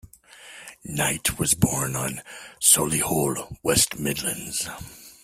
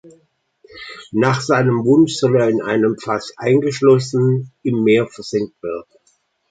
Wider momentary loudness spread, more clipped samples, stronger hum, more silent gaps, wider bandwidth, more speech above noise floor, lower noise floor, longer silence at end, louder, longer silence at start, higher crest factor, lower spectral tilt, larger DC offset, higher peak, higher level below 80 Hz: first, 22 LU vs 14 LU; neither; neither; neither; first, 16 kHz vs 9.4 kHz; second, 23 dB vs 46 dB; second, -48 dBFS vs -62 dBFS; second, 0.15 s vs 0.7 s; second, -22 LUFS vs -17 LUFS; second, 0.35 s vs 0.75 s; first, 26 dB vs 16 dB; second, -3 dB/octave vs -6.5 dB/octave; neither; about the same, 0 dBFS vs -2 dBFS; first, -50 dBFS vs -58 dBFS